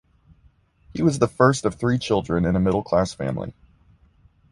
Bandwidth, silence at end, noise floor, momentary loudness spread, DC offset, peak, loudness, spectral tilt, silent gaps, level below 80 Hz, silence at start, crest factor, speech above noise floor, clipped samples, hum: 11.5 kHz; 1 s; -58 dBFS; 11 LU; under 0.1%; -4 dBFS; -22 LUFS; -6.5 dB/octave; none; -44 dBFS; 0.95 s; 20 dB; 37 dB; under 0.1%; none